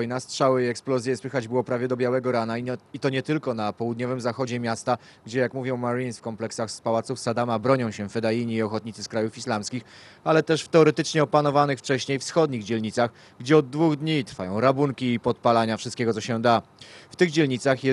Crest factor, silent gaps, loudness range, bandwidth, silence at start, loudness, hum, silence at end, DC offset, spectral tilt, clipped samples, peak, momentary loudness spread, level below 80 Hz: 20 dB; none; 5 LU; 12 kHz; 0 s; -25 LUFS; none; 0 s; under 0.1%; -5.5 dB/octave; under 0.1%; -4 dBFS; 8 LU; -68 dBFS